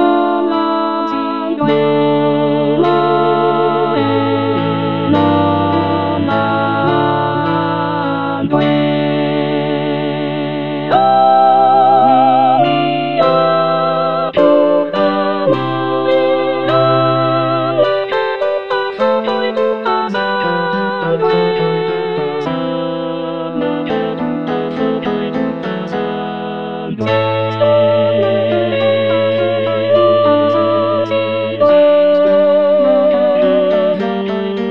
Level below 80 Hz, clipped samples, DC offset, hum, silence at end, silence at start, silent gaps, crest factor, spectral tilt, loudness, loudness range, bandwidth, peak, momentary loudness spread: -54 dBFS; under 0.1%; 0.8%; none; 0 s; 0 s; none; 12 dB; -8.5 dB/octave; -14 LUFS; 6 LU; 6 kHz; 0 dBFS; 8 LU